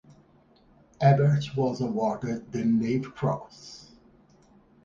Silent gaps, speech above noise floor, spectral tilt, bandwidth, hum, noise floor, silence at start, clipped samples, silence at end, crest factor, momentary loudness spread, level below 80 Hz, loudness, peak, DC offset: none; 34 dB; -8 dB/octave; 7.4 kHz; none; -59 dBFS; 1 s; under 0.1%; 1.05 s; 20 dB; 22 LU; -60 dBFS; -26 LUFS; -8 dBFS; under 0.1%